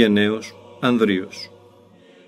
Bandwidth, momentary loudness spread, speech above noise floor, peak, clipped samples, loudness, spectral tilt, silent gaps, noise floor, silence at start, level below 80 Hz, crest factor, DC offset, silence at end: 12.5 kHz; 19 LU; 31 dB; -2 dBFS; under 0.1%; -20 LUFS; -6 dB/octave; none; -50 dBFS; 0 s; -66 dBFS; 20 dB; under 0.1%; 0.8 s